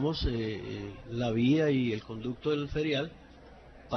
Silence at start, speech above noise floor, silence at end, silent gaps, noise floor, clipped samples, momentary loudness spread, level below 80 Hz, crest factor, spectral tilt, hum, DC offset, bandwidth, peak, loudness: 0 s; 22 dB; 0 s; none; -52 dBFS; under 0.1%; 13 LU; -46 dBFS; 16 dB; -7.5 dB/octave; none; under 0.1%; 6.4 kHz; -16 dBFS; -31 LUFS